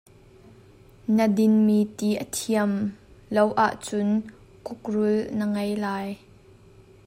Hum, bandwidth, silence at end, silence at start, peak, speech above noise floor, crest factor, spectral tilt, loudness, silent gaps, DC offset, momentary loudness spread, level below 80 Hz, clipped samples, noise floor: none; 16 kHz; 0.9 s; 1.1 s; -8 dBFS; 29 dB; 16 dB; -6 dB/octave; -24 LUFS; none; under 0.1%; 16 LU; -60 dBFS; under 0.1%; -52 dBFS